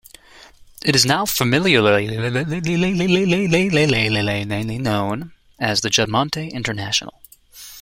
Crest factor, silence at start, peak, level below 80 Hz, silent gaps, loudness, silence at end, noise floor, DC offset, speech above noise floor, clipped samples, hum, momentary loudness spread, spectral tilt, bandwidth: 18 dB; 0.85 s; 0 dBFS; -46 dBFS; none; -18 LUFS; 0 s; -46 dBFS; under 0.1%; 27 dB; under 0.1%; none; 10 LU; -4 dB/octave; 16.5 kHz